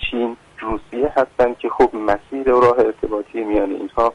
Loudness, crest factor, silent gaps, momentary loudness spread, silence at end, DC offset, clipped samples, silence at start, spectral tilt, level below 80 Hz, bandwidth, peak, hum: -19 LUFS; 14 dB; none; 11 LU; 0 s; under 0.1%; under 0.1%; 0 s; -6.5 dB/octave; -40 dBFS; 10 kHz; -4 dBFS; none